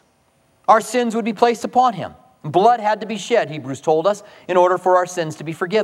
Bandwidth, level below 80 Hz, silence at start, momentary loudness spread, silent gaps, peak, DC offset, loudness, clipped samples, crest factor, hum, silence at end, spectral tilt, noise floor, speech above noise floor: 14 kHz; -66 dBFS; 0.7 s; 11 LU; none; 0 dBFS; under 0.1%; -18 LUFS; under 0.1%; 18 dB; none; 0 s; -5 dB/octave; -60 dBFS; 42 dB